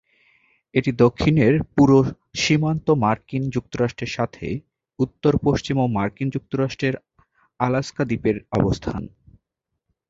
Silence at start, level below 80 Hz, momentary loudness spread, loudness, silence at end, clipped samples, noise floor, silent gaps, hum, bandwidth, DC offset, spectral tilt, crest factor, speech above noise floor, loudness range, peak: 0.75 s; -44 dBFS; 10 LU; -21 LUFS; 1.05 s; under 0.1%; -80 dBFS; none; none; 7.8 kHz; under 0.1%; -6.5 dB/octave; 20 dB; 60 dB; 6 LU; -2 dBFS